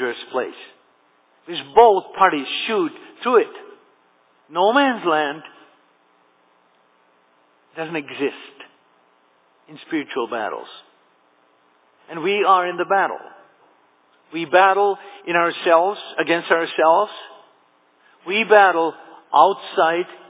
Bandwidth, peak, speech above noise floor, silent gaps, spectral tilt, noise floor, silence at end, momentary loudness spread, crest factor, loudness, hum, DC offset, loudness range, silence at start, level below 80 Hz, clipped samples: 4 kHz; 0 dBFS; 41 dB; none; -8 dB/octave; -59 dBFS; 0.15 s; 16 LU; 20 dB; -19 LUFS; none; under 0.1%; 14 LU; 0 s; -70 dBFS; under 0.1%